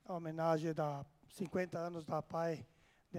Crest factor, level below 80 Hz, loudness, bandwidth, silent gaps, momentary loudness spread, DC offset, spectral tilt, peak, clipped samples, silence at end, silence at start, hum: 20 dB; -76 dBFS; -40 LUFS; 15.5 kHz; none; 11 LU; under 0.1%; -7 dB/octave; -22 dBFS; under 0.1%; 0 s; 0.1 s; none